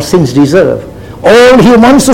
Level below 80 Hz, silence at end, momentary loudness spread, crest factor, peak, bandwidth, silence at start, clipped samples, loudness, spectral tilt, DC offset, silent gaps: -30 dBFS; 0 s; 9 LU; 4 dB; 0 dBFS; 16.5 kHz; 0 s; 7%; -5 LUFS; -5.5 dB/octave; under 0.1%; none